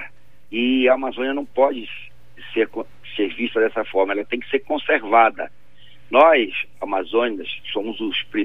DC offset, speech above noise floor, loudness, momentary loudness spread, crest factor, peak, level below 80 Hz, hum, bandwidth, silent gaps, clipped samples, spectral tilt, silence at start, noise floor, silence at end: 1%; 32 dB; -20 LUFS; 15 LU; 20 dB; -2 dBFS; -62 dBFS; none; 5.2 kHz; none; under 0.1%; -6 dB/octave; 0 s; -52 dBFS; 0 s